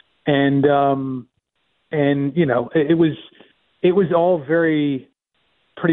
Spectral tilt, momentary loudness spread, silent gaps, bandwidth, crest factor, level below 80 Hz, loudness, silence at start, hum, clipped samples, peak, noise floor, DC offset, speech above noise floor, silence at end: -11.5 dB/octave; 10 LU; none; 4.1 kHz; 16 dB; -60 dBFS; -18 LUFS; 0.25 s; none; under 0.1%; -4 dBFS; -69 dBFS; under 0.1%; 52 dB; 0 s